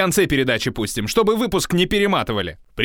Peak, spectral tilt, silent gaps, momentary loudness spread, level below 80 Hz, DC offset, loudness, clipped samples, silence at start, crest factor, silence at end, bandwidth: -2 dBFS; -4.5 dB/octave; none; 7 LU; -40 dBFS; under 0.1%; -19 LUFS; under 0.1%; 0 s; 18 dB; 0 s; 18.5 kHz